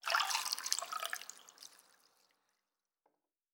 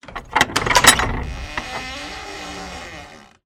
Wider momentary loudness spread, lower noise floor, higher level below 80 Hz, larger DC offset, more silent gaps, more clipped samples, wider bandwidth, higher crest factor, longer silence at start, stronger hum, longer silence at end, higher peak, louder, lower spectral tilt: about the same, 22 LU vs 21 LU; first, -90 dBFS vs -41 dBFS; second, under -90 dBFS vs -34 dBFS; neither; neither; neither; first, over 20 kHz vs 17 kHz; first, 32 dB vs 22 dB; about the same, 0.05 s vs 0.05 s; neither; first, 1.85 s vs 0.2 s; second, -10 dBFS vs 0 dBFS; second, -37 LUFS vs -17 LUFS; second, 4 dB/octave vs -1.5 dB/octave